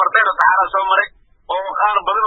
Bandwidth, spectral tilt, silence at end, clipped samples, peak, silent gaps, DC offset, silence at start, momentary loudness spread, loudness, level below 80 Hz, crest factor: 7.2 kHz; -2.5 dB/octave; 0 s; under 0.1%; 0 dBFS; none; under 0.1%; 0 s; 11 LU; -16 LUFS; -52 dBFS; 16 dB